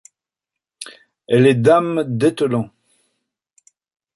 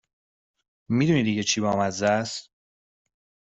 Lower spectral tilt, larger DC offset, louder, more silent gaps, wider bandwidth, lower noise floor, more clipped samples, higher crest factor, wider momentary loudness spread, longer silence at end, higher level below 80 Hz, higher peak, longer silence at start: first, -7 dB/octave vs -4.5 dB/octave; neither; first, -16 LUFS vs -24 LUFS; neither; first, 11.5 kHz vs 8.2 kHz; second, -86 dBFS vs under -90 dBFS; neither; about the same, 18 dB vs 18 dB; first, 23 LU vs 8 LU; first, 1.5 s vs 1.1 s; about the same, -58 dBFS vs -62 dBFS; first, -2 dBFS vs -10 dBFS; about the same, 0.8 s vs 0.9 s